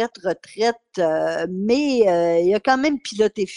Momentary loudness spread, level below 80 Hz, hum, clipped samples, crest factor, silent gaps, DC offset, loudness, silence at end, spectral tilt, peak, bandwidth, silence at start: 7 LU; -58 dBFS; none; under 0.1%; 16 dB; none; under 0.1%; -20 LUFS; 0 s; -5 dB/octave; -2 dBFS; 11 kHz; 0 s